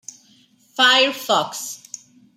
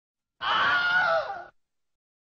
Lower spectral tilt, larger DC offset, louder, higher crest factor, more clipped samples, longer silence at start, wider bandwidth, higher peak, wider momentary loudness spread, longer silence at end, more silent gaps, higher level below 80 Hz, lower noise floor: first, -0.5 dB/octave vs 2 dB/octave; neither; first, -17 LUFS vs -24 LUFS; first, 20 dB vs 14 dB; neither; first, 0.75 s vs 0.4 s; first, 16 kHz vs 7 kHz; first, -2 dBFS vs -14 dBFS; first, 23 LU vs 14 LU; second, 0.6 s vs 0.75 s; neither; second, -78 dBFS vs -66 dBFS; about the same, -55 dBFS vs -58 dBFS